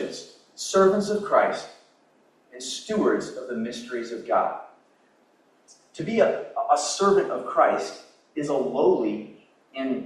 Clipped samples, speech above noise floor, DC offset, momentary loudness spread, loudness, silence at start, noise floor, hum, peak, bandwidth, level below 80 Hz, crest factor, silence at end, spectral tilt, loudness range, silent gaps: under 0.1%; 38 dB; under 0.1%; 16 LU; -24 LUFS; 0 s; -61 dBFS; none; -6 dBFS; 12 kHz; -70 dBFS; 20 dB; 0 s; -4.5 dB/octave; 5 LU; none